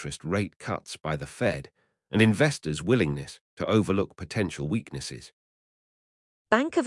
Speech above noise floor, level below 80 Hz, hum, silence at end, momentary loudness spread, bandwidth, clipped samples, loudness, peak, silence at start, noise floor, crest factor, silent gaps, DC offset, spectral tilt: over 63 dB; -56 dBFS; none; 0 s; 13 LU; 12 kHz; under 0.1%; -27 LUFS; -4 dBFS; 0 s; under -90 dBFS; 24 dB; 0.56-0.60 s, 3.41-3.57 s, 5.33-6.45 s; under 0.1%; -6 dB/octave